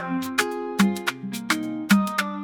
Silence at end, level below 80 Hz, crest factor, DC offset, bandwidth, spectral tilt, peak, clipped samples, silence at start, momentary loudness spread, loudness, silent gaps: 0 s; -64 dBFS; 20 dB; under 0.1%; 19 kHz; -4.5 dB/octave; -6 dBFS; under 0.1%; 0 s; 8 LU; -24 LUFS; none